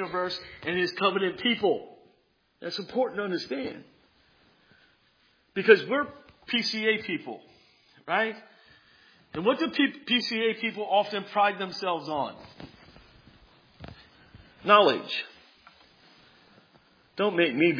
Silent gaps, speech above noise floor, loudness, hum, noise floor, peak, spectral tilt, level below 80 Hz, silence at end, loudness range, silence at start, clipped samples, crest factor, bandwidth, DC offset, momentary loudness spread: none; 42 dB; -27 LUFS; none; -68 dBFS; -4 dBFS; -5 dB/octave; -66 dBFS; 0 s; 6 LU; 0 s; under 0.1%; 24 dB; 5.4 kHz; under 0.1%; 21 LU